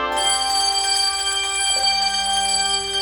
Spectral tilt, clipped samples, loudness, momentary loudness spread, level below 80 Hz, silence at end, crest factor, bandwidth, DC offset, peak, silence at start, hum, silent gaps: 1.5 dB/octave; under 0.1%; -17 LUFS; 2 LU; -46 dBFS; 0 s; 14 dB; 19.5 kHz; under 0.1%; -6 dBFS; 0 s; none; none